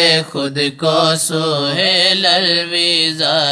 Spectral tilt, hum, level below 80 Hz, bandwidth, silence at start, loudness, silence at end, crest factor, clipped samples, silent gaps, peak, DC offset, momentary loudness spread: -3 dB/octave; none; -64 dBFS; 11 kHz; 0 s; -13 LUFS; 0 s; 14 dB; under 0.1%; none; 0 dBFS; under 0.1%; 6 LU